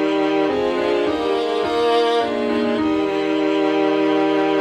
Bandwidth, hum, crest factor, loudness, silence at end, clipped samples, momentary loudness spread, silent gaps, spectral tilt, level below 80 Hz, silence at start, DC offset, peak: 9.8 kHz; none; 12 dB; -19 LUFS; 0 s; under 0.1%; 3 LU; none; -5 dB/octave; -54 dBFS; 0 s; under 0.1%; -8 dBFS